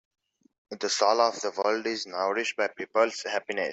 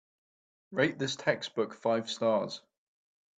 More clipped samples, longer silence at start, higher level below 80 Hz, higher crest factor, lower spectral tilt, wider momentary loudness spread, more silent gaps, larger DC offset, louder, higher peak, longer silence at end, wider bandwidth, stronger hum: neither; about the same, 0.7 s vs 0.7 s; about the same, -78 dBFS vs -76 dBFS; about the same, 20 dB vs 22 dB; second, -1.5 dB/octave vs -4.5 dB/octave; about the same, 8 LU vs 8 LU; neither; neither; first, -27 LUFS vs -31 LUFS; about the same, -8 dBFS vs -10 dBFS; second, 0 s vs 0.8 s; second, 8.2 kHz vs 9.2 kHz; neither